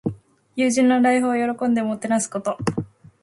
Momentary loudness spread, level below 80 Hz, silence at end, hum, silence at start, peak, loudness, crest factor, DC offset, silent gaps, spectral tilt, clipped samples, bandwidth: 14 LU; -56 dBFS; 0.4 s; none; 0.05 s; -6 dBFS; -21 LUFS; 16 dB; under 0.1%; none; -5 dB/octave; under 0.1%; 11.5 kHz